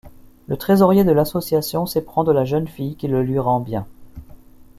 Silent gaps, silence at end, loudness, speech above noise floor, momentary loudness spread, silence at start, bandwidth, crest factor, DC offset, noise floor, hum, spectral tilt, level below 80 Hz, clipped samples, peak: none; 0.15 s; -19 LUFS; 25 dB; 14 LU; 0.05 s; 15 kHz; 18 dB; under 0.1%; -43 dBFS; none; -7 dB/octave; -46 dBFS; under 0.1%; -2 dBFS